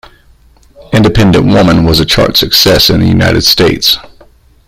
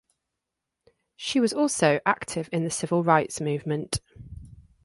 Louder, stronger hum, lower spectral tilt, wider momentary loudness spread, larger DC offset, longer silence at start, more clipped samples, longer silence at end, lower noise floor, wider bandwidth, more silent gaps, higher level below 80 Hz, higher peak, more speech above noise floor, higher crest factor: first, -7 LUFS vs -25 LUFS; neither; about the same, -4.5 dB/octave vs -4.5 dB/octave; second, 4 LU vs 19 LU; neither; second, 0.8 s vs 1.2 s; first, 0.4% vs under 0.1%; first, 0.6 s vs 0.35 s; second, -42 dBFS vs -85 dBFS; first, over 20 kHz vs 11.5 kHz; neither; first, -26 dBFS vs -54 dBFS; first, 0 dBFS vs -6 dBFS; second, 36 dB vs 60 dB; second, 8 dB vs 22 dB